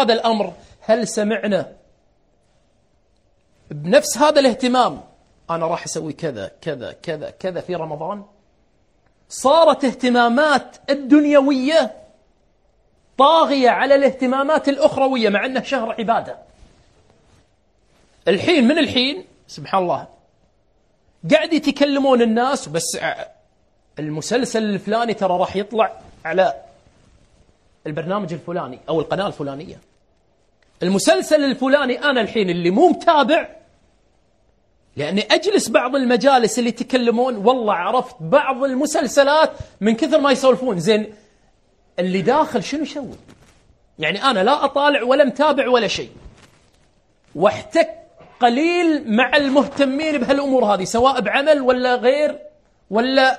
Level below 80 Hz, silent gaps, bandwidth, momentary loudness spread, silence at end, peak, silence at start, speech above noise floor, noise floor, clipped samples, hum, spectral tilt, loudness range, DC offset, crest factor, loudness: -56 dBFS; none; 12.5 kHz; 14 LU; 0 s; 0 dBFS; 0 s; 44 dB; -61 dBFS; under 0.1%; none; -4.5 dB/octave; 7 LU; under 0.1%; 18 dB; -18 LUFS